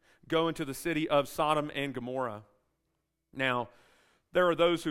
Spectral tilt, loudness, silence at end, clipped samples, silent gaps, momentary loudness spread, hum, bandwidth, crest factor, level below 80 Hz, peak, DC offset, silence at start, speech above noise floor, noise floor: -5 dB/octave; -31 LUFS; 0 s; under 0.1%; none; 10 LU; none; 16 kHz; 20 dB; -62 dBFS; -12 dBFS; under 0.1%; 0.3 s; 51 dB; -81 dBFS